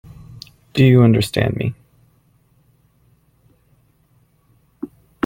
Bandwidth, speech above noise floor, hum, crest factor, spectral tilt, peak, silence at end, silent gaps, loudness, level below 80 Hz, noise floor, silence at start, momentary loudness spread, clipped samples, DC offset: 16 kHz; 44 dB; none; 18 dB; -7.5 dB/octave; -2 dBFS; 0.4 s; none; -16 LUFS; -48 dBFS; -58 dBFS; 0.75 s; 27 LU; under 0.1%; under 0.1%